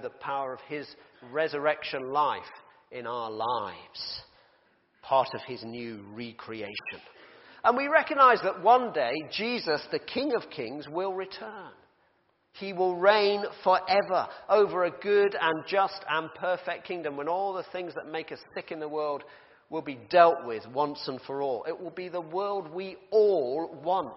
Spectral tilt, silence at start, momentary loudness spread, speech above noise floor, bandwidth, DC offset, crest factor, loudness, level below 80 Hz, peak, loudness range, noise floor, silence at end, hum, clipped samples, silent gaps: -2 dB/octave; 0 s; 16 LU; 41 dB; 5.8 kHz; under 0.1%; 24 dB; -28 LUFS; -74 dBFS; -4 dBFS; 9 LU; -70 dBFS; 0 s; none; under 0.1%; none